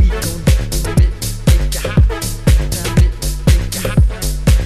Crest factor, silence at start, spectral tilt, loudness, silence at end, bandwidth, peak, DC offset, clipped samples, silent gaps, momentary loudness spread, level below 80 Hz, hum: 12 dB; 0 s; -5.5 dB/octave; -16 LUFS; 0 s; 14 kHz; 0 dBFS; under 0.1%; under 0.1%; none; 3 LU; -14 dBFS; none